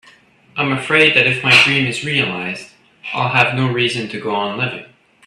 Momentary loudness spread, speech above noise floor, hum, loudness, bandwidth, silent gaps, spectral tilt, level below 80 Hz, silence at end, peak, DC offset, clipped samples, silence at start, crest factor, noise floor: 16 LU; 33 dB; none; -14 LUFS; 13.5 kHz; none; -4.5 dB/octave; -56 dBFS; 0.4 s; 0 dBFS; under 0.1%; under 0.1%; 0.55 s; 18 dB; -49 dBFS